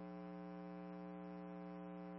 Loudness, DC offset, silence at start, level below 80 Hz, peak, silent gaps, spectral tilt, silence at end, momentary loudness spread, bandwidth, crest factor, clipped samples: -52 LUFS; under 0.1%; 0 s; -80 dBFS; -44 dBFS; none; -8 dB/octave; 0 s; 0 LU; 5.6 kHz; 6 dB; under 0.1%